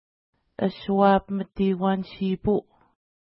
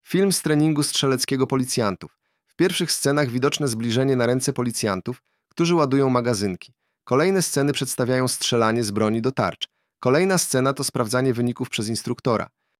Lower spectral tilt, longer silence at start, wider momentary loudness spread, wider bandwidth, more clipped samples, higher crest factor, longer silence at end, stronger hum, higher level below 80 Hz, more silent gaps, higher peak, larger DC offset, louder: first, -11.5 dB/octave vs -4.5 dB/octave; first, 0.6 s vs 0.1 s; about the same, 9 LU vs 7 LU; second, 5.8 kHz vs 16 kHz; neither; about the same, 18 dB vs 18 dB; first, 0.6 s vs 0.35 s; neither; first, -50 dBFS vs -60 dBFS; neither; second, -8 dBFS vs -4 dBFS; neither; about the same, -24 LUFS vs -22 LUFS